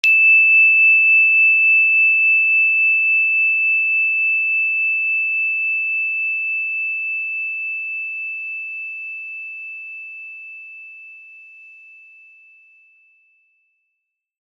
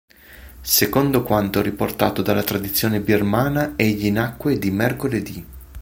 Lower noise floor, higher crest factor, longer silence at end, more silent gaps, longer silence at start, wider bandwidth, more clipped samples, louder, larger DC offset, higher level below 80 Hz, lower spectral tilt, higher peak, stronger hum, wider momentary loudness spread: first, -77 dBFS vs -43 dBFS; about the same, 16 dB vs 20 dB; first, 3.05 s vs 0 s; neither; second, 0.05 s vs 0.3 s; second, 6.8 kHz vs 17 kHz; neither; first, -13 LUFS vs -20 LUFS; neither; second, under -90 dBFS vs -42 dBFS; second, 5.5 dB/octave vs -5 dB/octave; about the same, -2 dBFS vs 0 dBFS; neither; first, 20 LU vs 7 LU